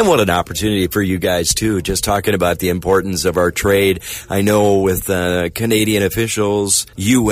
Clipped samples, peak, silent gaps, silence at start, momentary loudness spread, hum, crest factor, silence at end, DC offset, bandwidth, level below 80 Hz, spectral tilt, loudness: under 0.1%; -2 dBFS; none; 0 s; 4 LU; none; 14 dB; 0 s; under 0.1%; 16 kHz; -36 dBFS; -4 dB/octave; -16 LUFS